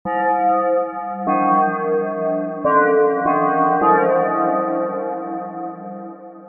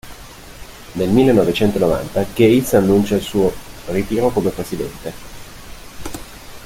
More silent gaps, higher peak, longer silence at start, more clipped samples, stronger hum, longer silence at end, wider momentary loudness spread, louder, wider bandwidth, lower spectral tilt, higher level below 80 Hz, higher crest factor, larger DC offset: neither; about the same, -4 dBFS vs -2 dBFS; about the same, 0.05 s vs 0.05 s; neither; neither; about the same, 0 s vs 0 s; second, 14 LU vs 24 LU; about the same, -18 LUFS vs -17 LUFS; second, 3.4 kHz vs 16.5 kHz; first, -10.5 dB/octave vs -6 dB/octave; second, -62 dBFS vs -38 dBFS; about the same, 16 dB vs 16 dB; neither